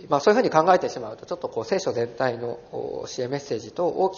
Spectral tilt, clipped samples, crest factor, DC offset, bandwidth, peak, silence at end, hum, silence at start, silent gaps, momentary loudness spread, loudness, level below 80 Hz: -4 dB/octave; under 0.1%; 22 dB; under 0.1%; 7.2 kHz; -2 dBFS; 0 s; none; 0 s; none; 14 LU; -24 LUFS; -64 dBFS